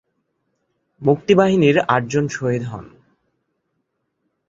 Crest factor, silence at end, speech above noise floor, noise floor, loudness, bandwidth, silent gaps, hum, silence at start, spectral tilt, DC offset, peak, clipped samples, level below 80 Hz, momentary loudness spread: 18 dB; 1.6 s; 56 dB; -73 dBFS; -17 LUFS; 7.8 kHz; none; none; 1 s; -6.5 dB/octave; under 0.1%; -2 dBFS; under 0.1%; -56 dBFS; 11 LU